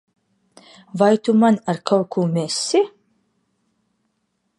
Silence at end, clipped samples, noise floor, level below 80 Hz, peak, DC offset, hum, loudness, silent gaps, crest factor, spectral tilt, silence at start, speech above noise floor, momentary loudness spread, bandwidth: 1.7 s; under 0.1%; -71 dBFS; -72 dBFS; -2 dBFS; under 0.1%; none; -19 LUFS; none; 18 dB; -5.5 dB/octave; 0.95 s; 53 dB; 6 LU; 11.5 kHz